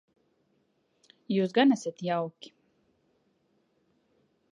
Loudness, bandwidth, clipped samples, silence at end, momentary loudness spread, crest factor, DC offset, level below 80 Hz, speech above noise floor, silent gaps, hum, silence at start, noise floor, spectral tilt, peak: -28 LUFS; 10 kHz; under 0.1%; 2.2 s; 9 LU; 22 dB; under 0.1%; -84 dBFS; 45 dB; none; none; 1.3 s; -72 dBFS; -6 dB/octave; -12 dBFS